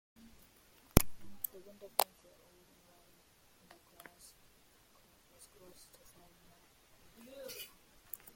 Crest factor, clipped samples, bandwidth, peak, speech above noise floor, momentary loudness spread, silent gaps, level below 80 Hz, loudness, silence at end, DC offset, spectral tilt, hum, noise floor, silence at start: 38 dB; under 0.1%; 16.5 kHz; -4 dBFS; 22 dB; 30 LU; none; -50 dBFS; -37 LUFS; 0.7 s; under 0.1%; -4.5 dB/octave; none; -66 dBFS; 0.95 s